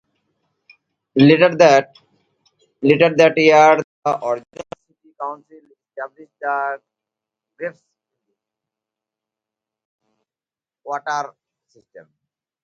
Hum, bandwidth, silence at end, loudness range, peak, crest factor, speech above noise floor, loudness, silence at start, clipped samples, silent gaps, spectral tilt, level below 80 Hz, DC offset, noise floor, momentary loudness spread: none; 7.6 kHz; 0.65 s; 23 LU; 0 dBFS; 20 dB; over 74 dB; -15 LUFS; 1.15 s; under 0.1%; 3.84-4.02 s, 9.85-9.99 s; -5.5 dB/octave; -64 dBFS; under 0.1%; under -90 dBFS; 22 LU